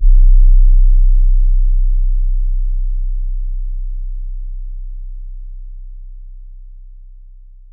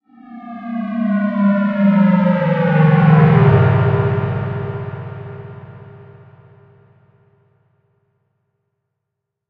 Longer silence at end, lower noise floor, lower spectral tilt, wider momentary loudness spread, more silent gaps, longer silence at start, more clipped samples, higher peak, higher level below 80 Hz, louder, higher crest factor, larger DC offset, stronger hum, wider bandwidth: second, 0.7 s vs 3.45 s; second, -37 dBFS vs -79 dBFS; first, -13 dB/octave vs -11 dB/octave; about the same, 24 LU vs 22 LU; neither; second, 0 s vs 0.3 s; neither; about the same, -2 dBFS vs 0 dBFS; first, -12 dBFS vs -46 dBFS; second, -18 LUFS vs -15 LUFS; about the same, 12 dB vs 16 dB; neither; neither; second, 0.3 kHz vs 4.6 kHz